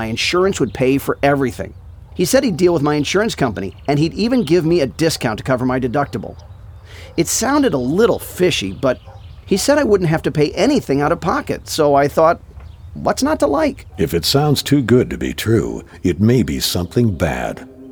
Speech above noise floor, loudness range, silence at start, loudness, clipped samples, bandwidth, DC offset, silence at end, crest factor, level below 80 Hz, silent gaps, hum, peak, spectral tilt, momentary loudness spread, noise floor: 20 dB; 2 LU; 0 s; -17 LUFS; under 0.1%; over 20 kHz; under 0.1%; 0 s; 16 dB; -38 dBFS; none; none; -2 dBFS; -5 dB/octave; 9 LU; -36 dBFS